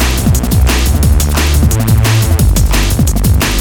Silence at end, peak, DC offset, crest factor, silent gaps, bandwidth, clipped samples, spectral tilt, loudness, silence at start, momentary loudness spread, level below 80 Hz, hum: 0 s; 0 dBFS; under 0.1%; 10 dB; none; 19 kHz; under 0.1%; -5 dB/octave; -11 LUFS; 0 s; 2 LU; -12 dBFS; none